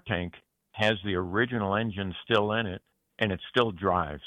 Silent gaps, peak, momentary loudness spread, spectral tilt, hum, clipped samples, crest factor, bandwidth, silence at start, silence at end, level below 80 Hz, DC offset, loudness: none; -8 dBFS; 10 LU; -6.5 dB/octave; none; under 0.1%; 20 dB; 10.5 kHz; 0.05 s; 0 s; -54 dBFS; under 0.1%; -28 LUFS